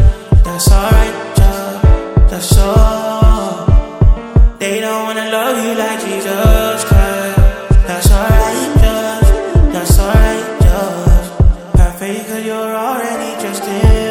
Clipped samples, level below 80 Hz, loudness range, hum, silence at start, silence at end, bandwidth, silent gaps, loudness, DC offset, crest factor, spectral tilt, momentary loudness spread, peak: 0.6%; -12 dBFS; 2 LU; none; 0 s; 0 s; 16.5 kHz; none; -13 LUFS; under 0.1%; 10 dB; -5.5 dB/octave; 7 LU; 0 dBFS